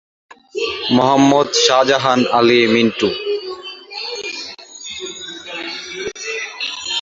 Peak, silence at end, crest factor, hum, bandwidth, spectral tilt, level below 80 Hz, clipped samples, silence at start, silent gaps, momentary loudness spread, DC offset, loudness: 0 dBFS; 0 s; 16 dB; none; 7.8 kHz; -3.5 dB/octave; -56 dBFS; under 0.1%; 0.3 s; none; 17 LU; under 0.1%; -16 LUFS